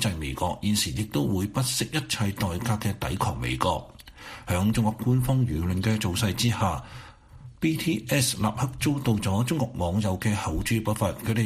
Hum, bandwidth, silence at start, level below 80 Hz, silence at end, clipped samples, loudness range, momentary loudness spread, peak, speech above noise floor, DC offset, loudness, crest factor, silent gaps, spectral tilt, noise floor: none; 15.5 kHz; 0 s; -44 dBFS; 0 s; under 0.1%; 2 LU; 5 LU; -8 dBFS; 21 dB; under 0.1%; -26 LUFS; 18 dB; none; -5 dB/octave; -47 dBFS